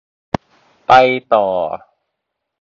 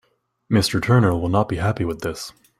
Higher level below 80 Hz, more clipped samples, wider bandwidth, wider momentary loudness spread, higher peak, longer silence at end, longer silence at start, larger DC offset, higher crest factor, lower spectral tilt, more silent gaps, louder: about the same, -50 dBFS vs -46 dBFS; neither; second, 7.2 kHz vs 15.5 kHz; first, 16 LU vs 11 LU; first, 0 dBFS vs -4 dBFS; first, 0.85 s vs 0.3 s; first, 0.9 s vs 0.5 s; neither; about the same, 16 dB vs 18 dB; about the same, -5.5 dB/octave vs -6 dB/octave; neither; first, -15 LUFS vs -20 LUFS